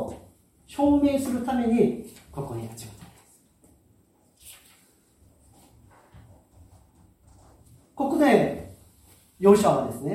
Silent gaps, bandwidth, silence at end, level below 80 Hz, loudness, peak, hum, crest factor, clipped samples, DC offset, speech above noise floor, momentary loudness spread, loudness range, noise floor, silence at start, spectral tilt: none; 16 kHz; 0 s; -56 dBFS; -23 LUFS; -4 dBFS; none; 24 dB; under 0.1%; under 0.1%; 40 dB; 25 LU; 18 LU; -62 dBFS; 0 s; -6.5 dB/octave